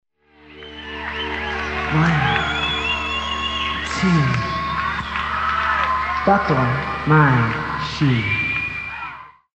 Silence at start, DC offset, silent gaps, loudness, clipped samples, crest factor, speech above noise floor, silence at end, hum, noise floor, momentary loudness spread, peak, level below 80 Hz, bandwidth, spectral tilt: 0.45 s; under 0.1%; none; -19 LUFS; under 0.1%; 18 dB; 33 dB; 0.25 s; none; -49 dBFS; 11 LU; -2 dBFS; -38 dBFS; 8.6 kHz; -6 dB/octave